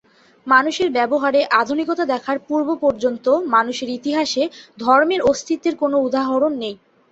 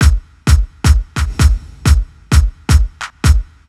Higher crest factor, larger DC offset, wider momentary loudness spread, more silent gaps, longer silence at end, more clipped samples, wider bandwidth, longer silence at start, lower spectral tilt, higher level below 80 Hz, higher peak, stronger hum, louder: about the same, 16 dB vs 12 dB; neither; first, 8 LU vs 4 LU; neither; about the same, 0.35 s vs 0.25 s; neither; second, 8 kHz vs 13.5 kHz; first, 0.45 s vs 0 s; second, -3.5 dB/octave vs -5 dB/octave; second, -58 dBFS vs -14 dBFS; about the same, -2 dBFS vs 0 dBFS; neither; second, -18 LUFS vs -15 LUFS